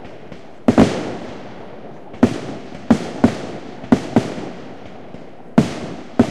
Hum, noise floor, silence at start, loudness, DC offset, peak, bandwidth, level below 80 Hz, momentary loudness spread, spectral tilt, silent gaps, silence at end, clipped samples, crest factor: none; -38 dBFS; 0 s; -19 LUFS; 2%; 0 dBFS; 11 kHz; -44 dBFS; 21 LU; -7 dB/octave; none; 0 s; under 0.1%; 20 dB